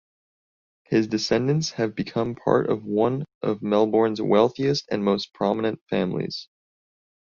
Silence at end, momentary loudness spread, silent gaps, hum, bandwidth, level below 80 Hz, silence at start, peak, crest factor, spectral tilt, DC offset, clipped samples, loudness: 0.95 s; 7 LU; 3.35-3.41 s, 5.81-5.86 s; none; 7.4 kHz; -60 dBFS; 0.9 s; -4 dBFS; 20 dB; -6 dB/octave; under 0.1%; under 0.1%; -24 LUFS